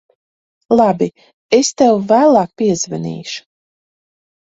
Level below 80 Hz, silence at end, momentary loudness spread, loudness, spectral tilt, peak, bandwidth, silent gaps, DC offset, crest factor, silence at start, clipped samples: -58 dBFS; 1.2 s; 13 LU; -14 LUFS; -4.5 dB/octave; 0 dBFS; 8 kHz; 1.33-1.49 s; under 0.1%; 16 dB; 0.7 s; under 0.1%